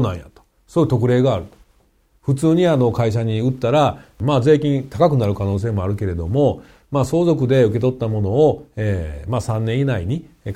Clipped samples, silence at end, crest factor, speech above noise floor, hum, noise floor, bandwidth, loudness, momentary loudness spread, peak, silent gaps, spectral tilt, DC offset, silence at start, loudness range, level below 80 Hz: under 0.1%; 0 s; 16 dB; 41 dB; none; -58 dBFS; 13 kHz; -18 LUFS; 9 LU; -2 dBFS; none; -8 dB/octave; under 0.1%; 0 s; 2 LU; -42 dBFS